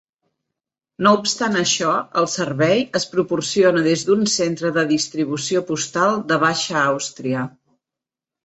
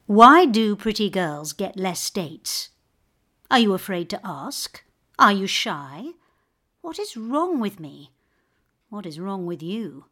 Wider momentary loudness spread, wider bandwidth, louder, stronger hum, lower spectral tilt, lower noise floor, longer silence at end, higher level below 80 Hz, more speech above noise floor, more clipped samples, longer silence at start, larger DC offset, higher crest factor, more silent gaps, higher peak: second, 7 LU vs 20 LU; second, 8.2 kHz vs 17.5 kHz; about the same, -19 LUFS vs -21 LUFS; neither; about the same, -3.5 dB/octave vs -4 dB/octave; first, -87 dBFS vs -70 dBFS; first, 0.95 s vs 0.1 s; about the same, -62 dBFS vs -60 dBFS; first, 68 dB vs 49 dB; neither; first, 1 s vs 0.1 s; neither; about the same, 18 dB vs 22 dB; neither; about the same, -2 dBFS vs 0 dBFS